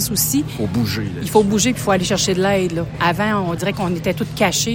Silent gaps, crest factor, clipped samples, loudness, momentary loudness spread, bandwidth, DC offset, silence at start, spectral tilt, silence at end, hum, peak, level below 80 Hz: none; 16 dB; under 0.1%; -18 LUFS; 5 LU; 17 kHz; under 0.1%; 0 s; -4 dB/octave; 0 s; none; -2 dBFS; -40 dBFS